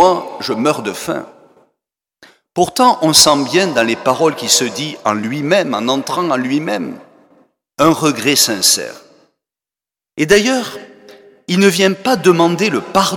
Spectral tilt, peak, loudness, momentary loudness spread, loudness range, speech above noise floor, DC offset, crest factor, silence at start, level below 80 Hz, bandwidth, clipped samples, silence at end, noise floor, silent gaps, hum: -3 dB/octave; 0 dBFS; -13 LUFS; 11 LU; 4 LU; 75 dB; under 0.1%; 16 dB; 0 s; -52 dBFS; 19.5 kHz; under 0.1%; 0 s; -89 dBFS; none; none